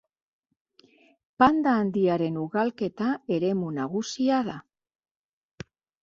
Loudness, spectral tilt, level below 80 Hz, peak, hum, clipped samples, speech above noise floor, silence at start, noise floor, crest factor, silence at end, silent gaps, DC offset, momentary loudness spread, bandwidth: -26 LUFS; -6.5 dB/octave; -62 dBFS; -6 dBFS; none; under 0.1%; 35 dB; 1.4 s; -60 dBFS; 22 dB; 1.4 s; none; under 0.1%; 22 LU; 7.6 kHz